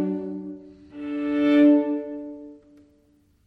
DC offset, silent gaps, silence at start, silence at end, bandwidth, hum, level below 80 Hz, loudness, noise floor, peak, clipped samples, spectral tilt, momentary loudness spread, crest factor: under 0.1%; none; 0 s; 0.9 s; 4.7 kHz; none; -64 dBFS; -22 LUFS; -61 dBFS; -8 dBFS; under 0.1%; -8 dB/octave; 24 LU; 16 dB